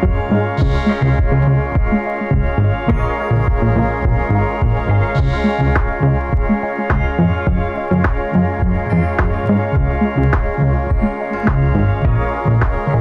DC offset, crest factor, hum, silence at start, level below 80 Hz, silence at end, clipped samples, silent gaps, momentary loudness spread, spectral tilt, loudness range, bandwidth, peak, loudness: under 0.1%; 14 dB; none; 0 s; -20 dBFS; 0 s; under 0.1%; none; 3 LU; -9.5 dB/octave; 1 LU; 6.6 kHz; -2 dBFS; -16 LUFS